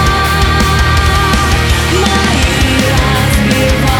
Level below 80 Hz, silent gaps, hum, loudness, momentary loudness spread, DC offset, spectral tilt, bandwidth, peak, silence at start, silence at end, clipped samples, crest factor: -16 dBFS; none; none; -10 LUFS; 1 LU; under 0.1%; -4.5 dB/octave; 18.5 kHz; 0 dBFS; 0 s; 0 s; under 0.1%; 10 dB